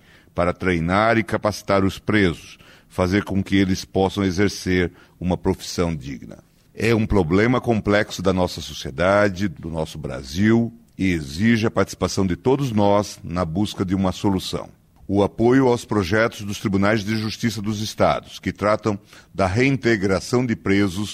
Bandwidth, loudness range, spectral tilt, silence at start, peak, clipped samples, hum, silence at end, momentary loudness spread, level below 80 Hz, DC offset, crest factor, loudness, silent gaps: 15.5 kHz; 2 LU; -6 dB/octave; 0.35 s; -6 dBFS; under 0.1%; none; 0 s; 10 LU; -42 dBFS; under 0.1%; 16 dB; -21 LUFS; none